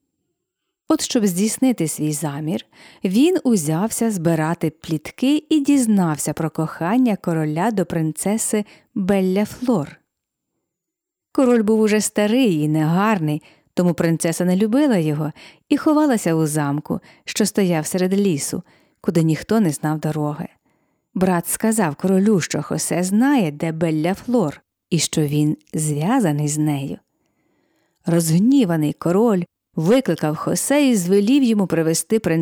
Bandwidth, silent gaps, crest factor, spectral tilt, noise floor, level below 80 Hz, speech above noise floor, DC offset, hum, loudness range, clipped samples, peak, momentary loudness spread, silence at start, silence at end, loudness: over 20 kHz; none; 16 dB; -5.5 dB/octave; -84 dBFS; -58 dBFS; 65 dB; under 0.1%; none; 3 LU; under 0.1%; -4 dBFS; 9 LU; 0.9 s; 0 s; -19 LUFS